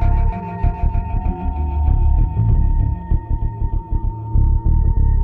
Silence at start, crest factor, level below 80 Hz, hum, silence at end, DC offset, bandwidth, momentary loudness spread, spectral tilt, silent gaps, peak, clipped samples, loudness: 0 s; 12 dB; -16 dBFS; none; 0 s; under 0.1%; 2.8 kHz; 6 LU; -12 dB/octave; none; -4 dBFS; under 0.1%; -20 LUFS